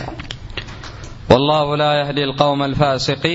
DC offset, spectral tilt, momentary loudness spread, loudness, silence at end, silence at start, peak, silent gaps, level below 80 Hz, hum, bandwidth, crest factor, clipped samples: under 0.1%; -5.5 dB/octave; 19 LU; -16 LUFS; 0 s; 0 s; 0 dBFS; none; -38 dBFS; none; 8 kHz; 18 dB; under 0.1%